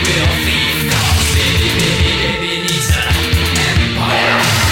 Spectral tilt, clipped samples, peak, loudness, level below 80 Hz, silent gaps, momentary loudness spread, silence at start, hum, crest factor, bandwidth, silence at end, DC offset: -3.5 dB/octave; under 0.1%; -2 dBFS; -13 LUFS; -22 dBFS; none; 3 LU; 0 s; none; 12 dB; 18 kHz; 0 s; under 0.1%